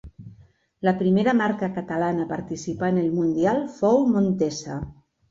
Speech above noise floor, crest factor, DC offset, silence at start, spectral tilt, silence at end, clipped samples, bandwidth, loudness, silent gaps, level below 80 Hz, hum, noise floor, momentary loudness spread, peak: 32 dB; 16 dB; under 0.1%; 0.05 s; -7 dB/octave; 0.4 s; under 0.1%; 7.8 kHz; -23 LUFS; none; -52 dBFS; none; -54 dBFS; 11 LU; -8 dBFS